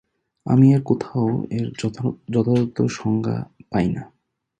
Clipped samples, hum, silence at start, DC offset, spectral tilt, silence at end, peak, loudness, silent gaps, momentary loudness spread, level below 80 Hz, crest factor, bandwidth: under 0.1%; none; 0.45 s; under 0.1%; -8 dB/octave; 0.55 s; -4 dBFS; -21 LUFS; none; 11 LU; -52 dBFS; 18 dB; 9.2 kHz